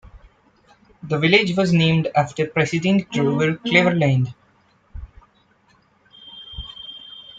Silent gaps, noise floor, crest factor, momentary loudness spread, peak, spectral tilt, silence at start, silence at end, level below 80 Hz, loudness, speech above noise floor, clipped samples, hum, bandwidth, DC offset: none; -59 dBFS; 20 dB; 23 LU; -2 dBFS; -6 dB/octave; 0.15 s; 0.2 s; -48 dBFS; -19 LUFS; 40 dB; under 0.1%; none; 7.8 kHz; under 0.1%